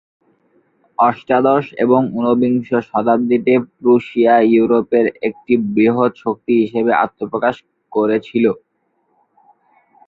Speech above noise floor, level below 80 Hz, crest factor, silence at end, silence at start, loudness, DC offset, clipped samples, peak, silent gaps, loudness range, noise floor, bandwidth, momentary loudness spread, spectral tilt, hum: 50 dB; -58 dBFS; 14 dB; 1.5 s; 1 s; -16 LUFS; under 0.1%; under 0.1%; -2 dBFS; none; 4 LU; -65 dBFS; 4.7 kHz; 6 LU; -9 dB/octave; none